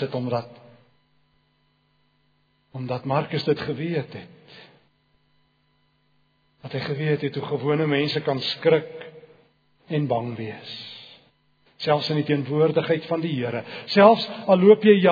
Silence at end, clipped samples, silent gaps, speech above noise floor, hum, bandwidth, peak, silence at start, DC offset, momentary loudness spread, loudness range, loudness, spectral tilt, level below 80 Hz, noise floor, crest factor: 0 s; under 0.1%; none; 45 dB; none; 5 kHz; 0 dBFS; 0 s; under 0.1%; 21 LU; 11 LU; -22 LUFS; -8 dB/octave; -68 dBFS; -66 dBFS; 24 dB